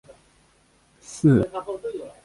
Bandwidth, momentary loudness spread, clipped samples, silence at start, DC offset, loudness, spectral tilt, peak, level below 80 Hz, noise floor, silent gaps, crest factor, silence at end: 11.5 kHz; 15 LU; under 0.1%; 1.1 s; under 0.1%; -23 LUFS; -8 dB/octave; -6 dBFS; -52 dBFS; -60 dBFS; none; 18 dB; 0.15 s